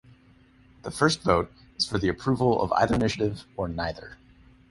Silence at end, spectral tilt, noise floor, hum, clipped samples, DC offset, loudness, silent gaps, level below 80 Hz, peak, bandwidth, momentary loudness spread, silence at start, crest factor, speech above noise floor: 0.55 s; -5.5 dB/octave; -57 dBFS; none; under 0.1%; under 0.1%; -26 LUFS; none; -46 dBFS; -6 dBFS; 11.5 kHz; 14 LU; 0.85 s; 22 dB; 32 dB